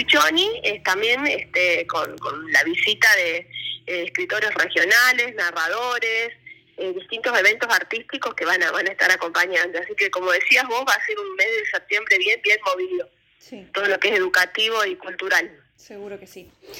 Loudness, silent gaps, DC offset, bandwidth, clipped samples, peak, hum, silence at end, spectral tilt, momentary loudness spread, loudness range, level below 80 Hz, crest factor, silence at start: -19 LUFS; none; under 0.1%; 17 kHz; under 0.1%; -4 dBFS; none; 0 s; -1 dB/octave; 14 LU; 3 LU; -66 dBFS; 18 dB; 0 s